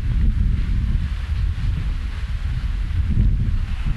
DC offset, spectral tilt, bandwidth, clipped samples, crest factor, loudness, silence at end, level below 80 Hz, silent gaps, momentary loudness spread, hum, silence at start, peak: under 0.1%; -7.5 dB/octave; 6.2 kHz; under 0.1%; 14 dB; -24 LUFS; 0 s; -20 dBFS; none; 6 LU; none; 0 s; -6 dBFS